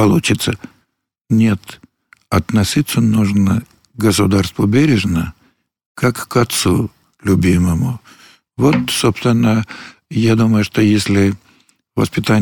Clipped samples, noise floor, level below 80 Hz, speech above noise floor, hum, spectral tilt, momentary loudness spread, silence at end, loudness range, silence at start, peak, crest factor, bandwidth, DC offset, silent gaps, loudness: under 0.1%; -68 dBFS; -40 dBFS; 54 dB; none; -5.5 dB/octave; 11 LU; 0 s; 2 LU; 0 s; -2 dBFS; 14 dB; 19 kHz; under 0.1%; 1.21-1.25 s, 5.86-5.95 s; -15 LUFS